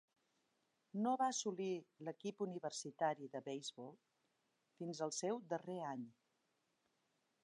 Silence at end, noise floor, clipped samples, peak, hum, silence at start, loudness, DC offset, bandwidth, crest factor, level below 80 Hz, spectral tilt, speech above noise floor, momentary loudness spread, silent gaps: 1.3 s; -85 dBFS; under 0.1%; -26 dBFS; none; 0.95 s; -44 LUFS; under 0.1%; 10.5 kHz; 20 dB; under -90 dBFS; -4 dB/octave; 41 dB; 12 LU; none